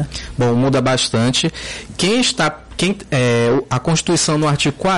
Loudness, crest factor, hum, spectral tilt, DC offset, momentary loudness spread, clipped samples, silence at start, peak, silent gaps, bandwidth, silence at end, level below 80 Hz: -16 LUFS; 12 dB; none; -4.5 dB/octave; under 0.1%; 5 LU; under 0.1%; 0 s; -4 dBFS; none; 11.5 kHz; 0 s; -40 dBFS